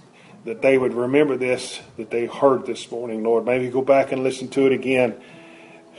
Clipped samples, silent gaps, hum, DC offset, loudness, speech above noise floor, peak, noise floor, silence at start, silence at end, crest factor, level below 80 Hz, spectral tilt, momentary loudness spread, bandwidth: under 0.1%; none; none; under 0.1%; -21 LUFS; 25 dB; -2 dBFS; -45 dBFS; 0.45 s; 0.2 s; 18 dB; -64 dBFS; -5.5 dB/octave; 11 LU; 11.5 kHz